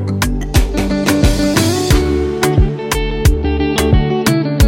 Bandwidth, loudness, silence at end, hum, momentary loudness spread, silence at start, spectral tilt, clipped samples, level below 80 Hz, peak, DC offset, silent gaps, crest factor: 17 kHz; -14 LUFS; 0 s; none; 4 LU; 0 s; -5.5 dB/octave; under 0.1%; -18 dBFS; 0 dBFS; under 0.1%; none; 12 dB